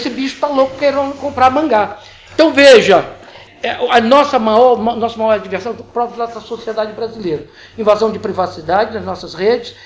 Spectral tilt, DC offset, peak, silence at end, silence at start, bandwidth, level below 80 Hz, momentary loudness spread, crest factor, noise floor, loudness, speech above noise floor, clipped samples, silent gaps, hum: -4.5 dB/octave; under 0.1%; 0 dBFS; 0.1 s; 0 s; 8 kHz; -46 dBFS; 14 LU; 14 dB; -37 dBFS; -13 LUFS; 24 dB; under 0.1%; none; none